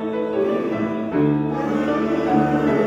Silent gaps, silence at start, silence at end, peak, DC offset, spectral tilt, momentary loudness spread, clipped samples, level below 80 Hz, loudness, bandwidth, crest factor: none; 0 s; 0 s; -6 dBFS; under 0.1%; -8.5 dB/octave; 5 LU; under 0.1%; -48 dBFS; -21 LUFS; 7.6 kHz; 14 dB